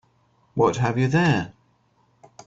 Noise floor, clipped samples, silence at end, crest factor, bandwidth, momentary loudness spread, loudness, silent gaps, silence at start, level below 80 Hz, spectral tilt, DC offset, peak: -63 dBFS; under 0.1%; 0.95 s; 18 dB; 7.8 kHz; 12 LU; -22 LUFS; none; 0.55 s; -56 dBFS; -6.5 dB/octave; under 0.1%; -6 dBFS